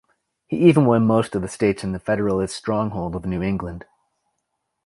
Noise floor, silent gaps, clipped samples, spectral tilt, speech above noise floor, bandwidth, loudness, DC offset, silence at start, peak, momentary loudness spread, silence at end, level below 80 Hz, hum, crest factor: -76 dBFS; none; under 0.1%; -7 dB/octave; 57 dB; 11.5 kHz; -21 LUFS; under 0.1%; 0.5 s; -2 dBFS; 12 LU; 1.05 s; -46 dBFS; none; 20 dB